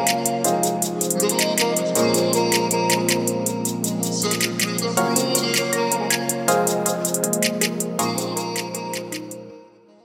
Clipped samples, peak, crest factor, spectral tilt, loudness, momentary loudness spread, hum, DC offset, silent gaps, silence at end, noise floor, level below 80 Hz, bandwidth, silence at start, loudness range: under 0.1%; -4 dBFS; 18 dB; -3 dB/octave; -21 LUFS; 7 LU; none; under 0.1%; none; 0.4 s; -47 dBFS; -64 dBFS; 17 kHz; 0 s; 3 LU